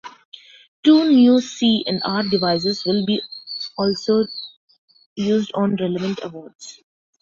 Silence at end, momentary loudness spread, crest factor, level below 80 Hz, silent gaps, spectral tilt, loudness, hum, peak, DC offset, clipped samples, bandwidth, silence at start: 0.5 s; 23 LU; 16 dB; -60 dBFS; 0.25-0.32 s, 0.68-0.83 s, 4.57-4.68 s, 4.78-4.88 s, 5.06-5.16 s, 6.55-6.59 s; -6 dB/octave; -19 LUFS; none; -4 dBFS; under 0.1%; under 0.1%; 7.6 kHz; 0.05 s